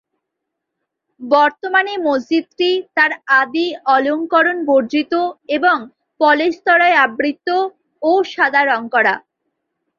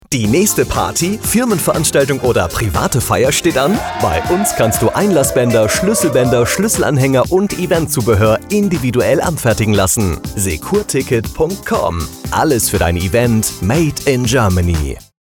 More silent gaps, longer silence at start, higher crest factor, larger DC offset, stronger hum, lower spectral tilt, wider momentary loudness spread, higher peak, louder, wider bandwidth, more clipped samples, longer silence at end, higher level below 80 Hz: neither; first, 1.2 s vs 0.1 s; about the same, 16 dB vs 12 dB; neither; neither; about the same, -4 dB/octave vs -4.5 dB/octave; first, 7 LU vs 4 LU; about the same, 0 dBFS vs -2 dBFS; about the same, -15 LUFS vs -14 LUFS; second, 7.2 kHz vs over 20 kHz; neither; first, 0.8 s vs 0.2 s; second, -66 dBFS vs -30 dBFS